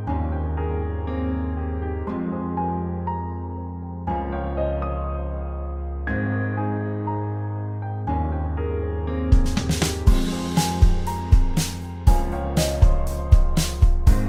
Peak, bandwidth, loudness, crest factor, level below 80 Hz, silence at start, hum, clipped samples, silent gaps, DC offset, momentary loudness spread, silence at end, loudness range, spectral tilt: -2 dBFS; 16 kHz; -24 LUFS; 20 dB; -24 dBFS; 0 s; none; under 0.1%; none; under 0.1%; 9 LU; 0 s; 6 LU; -6 dB/octave